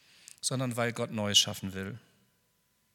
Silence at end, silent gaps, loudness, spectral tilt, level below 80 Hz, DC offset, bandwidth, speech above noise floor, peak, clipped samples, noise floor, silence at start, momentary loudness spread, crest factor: 0.95 s; none; -29 LUFS; -2.5 dB/octave; -76 dBFS; under 0.1%; 18 kHz; 42 dB; -10 dBFS; under 0.1%; -73 dBFS; 0.45 s; 16 LU; 24 dB